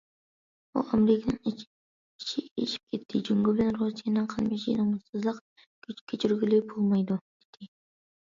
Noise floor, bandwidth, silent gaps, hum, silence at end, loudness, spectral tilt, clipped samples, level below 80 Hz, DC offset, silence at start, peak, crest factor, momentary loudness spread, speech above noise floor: under -90 dBFS; 7.6 kHz; 1.67-2.19 s, 2.51-2.56 s, 2.83-2.87 s, 5.09-5.13 s, 5.41-5.56 s, 5.66-5.82 s, 6.01-6.07 s, 7.21-7.53 s; none; 0.7 s; -29 LUFS; -7 dB/octave; under 0.1%; -62 dBFS; under 0.1%; 0.75 s; -12 dBFS; 18 dB; 11 LU; over 62 dB